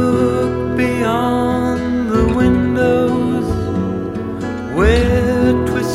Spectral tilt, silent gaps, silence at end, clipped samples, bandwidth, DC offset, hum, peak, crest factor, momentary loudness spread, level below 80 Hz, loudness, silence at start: -7 dB/octave; none; 0 s; under 0.1%; 13.5 kHz; under 0.1%; none; 0 dBFS; 14 dB; 7 LU; -26 dBFS; -16 LUFS; 0 s